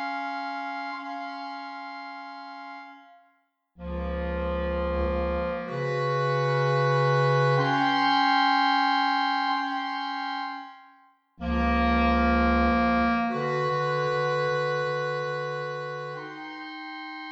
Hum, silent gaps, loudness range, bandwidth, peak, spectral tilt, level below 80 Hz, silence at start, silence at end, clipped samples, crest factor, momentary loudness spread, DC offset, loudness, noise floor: none; none; 13 LU; 7.8 kHz; -10 dBFS; -6.5 dB/octave; -38 dBFS; 0 s; 0 s; under 0.1%; 16 dB; 15 LU; under 0.1%; -26 LUFS; -68 dBFS